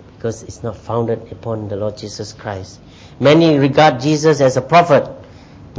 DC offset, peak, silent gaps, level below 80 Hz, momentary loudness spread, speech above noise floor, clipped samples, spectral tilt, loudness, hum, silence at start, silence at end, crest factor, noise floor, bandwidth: under 0.1%; 0 dBFS; none; -46 dBFS; 17 LU; 24 dB; under 0.1%; -6 dB/octave; -14 LUFS; none; 0.25 s; 0 s; 16 dB; -39 dBFS; 8 kHz